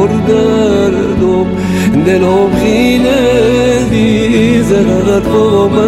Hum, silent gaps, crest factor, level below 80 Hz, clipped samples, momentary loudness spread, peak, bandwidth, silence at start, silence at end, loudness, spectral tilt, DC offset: none; none; 8 dB; -28 dBFS; under 0.1%; 2 LU; 0 dBFS; 15.5 kHz; 0 s; 0 s; -9 LUFS; -6.5 dB/octave; under 0.1%